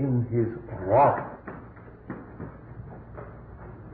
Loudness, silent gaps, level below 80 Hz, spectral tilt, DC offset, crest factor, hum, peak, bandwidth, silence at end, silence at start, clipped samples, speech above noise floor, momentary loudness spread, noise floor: -25 LUFS; none; -50 dBFS; -13 dB/octave; under 0.1%; 18 dB; none; -10 dBFS; 4.2 kHz; 0 s; 0 s; under 0.1%; 22 dB; 23 LU; -46 dBFS